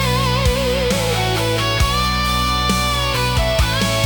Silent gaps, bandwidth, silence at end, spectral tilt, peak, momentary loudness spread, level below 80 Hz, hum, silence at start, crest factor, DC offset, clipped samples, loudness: none; 19 kHz; 0 s; -4 dB/octave; -2 dBFS; 1 LU; -24 dBFS; none; 0 s; 14 dB; under 0.1%; under 0.1%; -17 LUFS